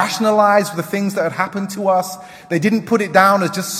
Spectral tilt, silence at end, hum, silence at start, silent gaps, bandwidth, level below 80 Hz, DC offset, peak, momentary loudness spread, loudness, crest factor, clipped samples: -4.5 dB/octave; 0 s; none; 0 s; none; 16 kHz; -64 dBFS; under 0.1%; 0 dBFS; 9 LU; -16 LUFS; 16 dB; under 0.1%